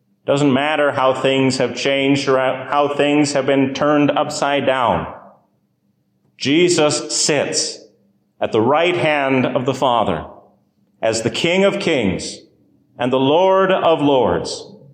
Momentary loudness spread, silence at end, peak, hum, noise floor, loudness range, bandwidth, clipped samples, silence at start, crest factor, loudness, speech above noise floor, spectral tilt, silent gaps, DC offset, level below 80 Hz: 9 LU; 0.2 s; -4 dBFS; none; -64 dBFS; 3 LU; 14.5 kHz; under 0.1%; 0.25 s; 14 dB; -17 LUFS; 48 dB; -4 dB/octave; none; under 0.1%; -50 dBFS